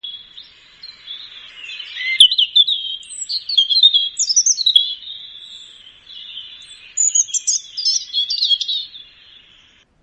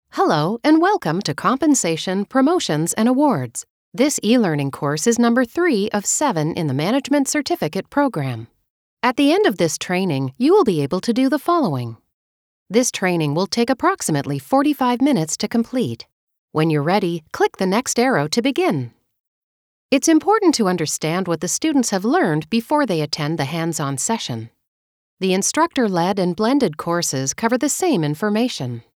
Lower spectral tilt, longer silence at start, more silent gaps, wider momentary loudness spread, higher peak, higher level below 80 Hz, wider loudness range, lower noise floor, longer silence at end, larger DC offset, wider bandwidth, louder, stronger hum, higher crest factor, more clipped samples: second, 6 dB/octave vs -4.5 dB/octave; about the same, 0.05 s vs 0.15 s; second, none vs 3.70-3.92 s, 8.70-8.97 s, 12.14-12.66 s, 16.12-16.28 s, 16.38-16.48 s, 19.20-19.89 s, 24.67-25.17 s; first, 24 LU vs 6 LU; about the same, 0 dBFS vs -2 dBFS; second, -66 dBFS vs -60 dBFS; first, 6 LU vs 2 LU; second, -52 dBFS vs under -90 dBFS; first, 1 s vs 0.15 s; neither; second, 11.5 kHz vs 18 kHz; first, -14 LUFS vs -19 LUFS; neither; about the same, 20 dB vs 16 dB; neither